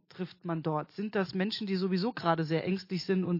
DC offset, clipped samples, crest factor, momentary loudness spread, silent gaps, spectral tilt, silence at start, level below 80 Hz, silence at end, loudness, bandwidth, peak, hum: under 0.1%; under 0.1%; 18 dB; 5 LU; none; -7.5 dB/octave; 0.15 s; -76 dBFS; 0 s; -32 LUFS; 5.8 kHz; -14 dBFS; none